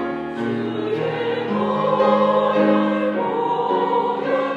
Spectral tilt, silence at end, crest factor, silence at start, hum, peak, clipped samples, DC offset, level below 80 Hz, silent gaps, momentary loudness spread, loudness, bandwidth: -7.5 dB/octave; 0 s; 14 dB; 0 s; none; -6 dBFS; under 0.1%; under 0.1%; -66 dBFS; none; 7 LU; -20 LUFS; 7.4 kHz